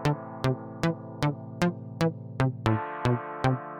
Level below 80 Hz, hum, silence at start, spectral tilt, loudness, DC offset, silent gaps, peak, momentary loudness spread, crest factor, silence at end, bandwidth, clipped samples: -50 dBFS; none; 0 s; -7 dB/octave; -29 LUFS; under 0.1%; none; -10 dBFS; 3 LU; 20 dB; 0 s; 14 kHz; under 0.1%